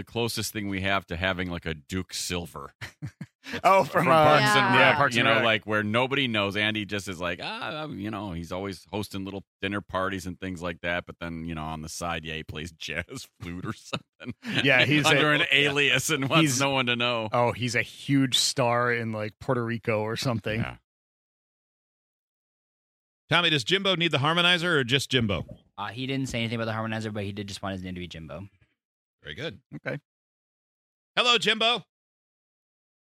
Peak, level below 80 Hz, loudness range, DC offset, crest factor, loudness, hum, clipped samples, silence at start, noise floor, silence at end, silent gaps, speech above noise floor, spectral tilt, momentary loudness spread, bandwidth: -4 dBFS; -56 dBFS; 12 LU; under 0.1%; 22 dB; -25 LUFS; none; under 0.1%; 0 s; under -90 dBFS; 1.2 s; 2.75-2.79 s, 3.35-3.39 s, 9.47-9.60 s, 14.09-14.19 s, 20.84-23.28 s, 28.85-29.19 s, 29.66-29.70 s, 30.05-31.15 s; over 64 dB; -4 dB/octave; 17 LU; 16 kHz